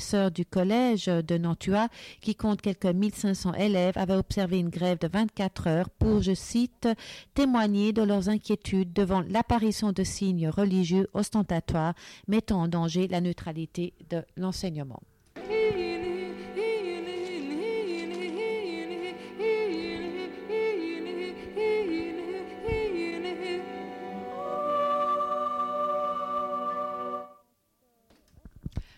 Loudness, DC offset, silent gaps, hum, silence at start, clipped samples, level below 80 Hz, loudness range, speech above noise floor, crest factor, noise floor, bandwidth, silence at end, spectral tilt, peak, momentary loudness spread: -29 LUFS; under 0.1%; none; none; 0 s; under 0.1%; -48 dBFS; 5 LU; 44 dB; 16 dB; -71 dBFS; 14 kHz; 0.15 s; -6.5 dB/octave; -12 dBFS; 10 LU